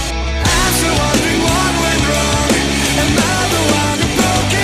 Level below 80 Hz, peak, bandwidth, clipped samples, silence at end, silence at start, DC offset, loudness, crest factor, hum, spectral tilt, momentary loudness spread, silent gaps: -24 dBFS; 0 dBFS; 15.5 kHz; under 0.1%; 0 s; 0 s; under 0.1%; -13 LUFS; 14 dB; none; -3.5 dB/octave; 1 LU; none